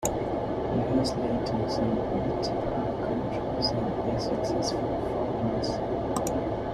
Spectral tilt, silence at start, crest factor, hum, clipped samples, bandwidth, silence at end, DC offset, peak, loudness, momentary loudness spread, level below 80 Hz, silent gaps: -6 dB/octave; 0 s; 16 dB; none; under 0.1%; 14 kHz; 0 s; under 0.1%; -12 dBFS; -29 LUFS; 3 LU; -44 dBFS; none